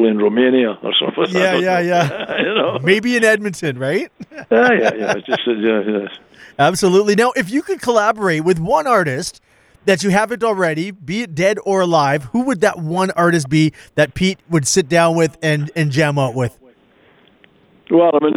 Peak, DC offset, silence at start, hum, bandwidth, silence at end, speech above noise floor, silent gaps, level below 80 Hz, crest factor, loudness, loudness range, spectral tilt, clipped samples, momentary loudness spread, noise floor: 0 dBFS; under 0.1%; 0 s; none; 16 kHz; 0.05 s; 36 dB; none; -52 dBFS; 16 dB; -16 LUFS; 2 LU; -5 dB/octave; under 0.1%; 8 LU; -52 dBFS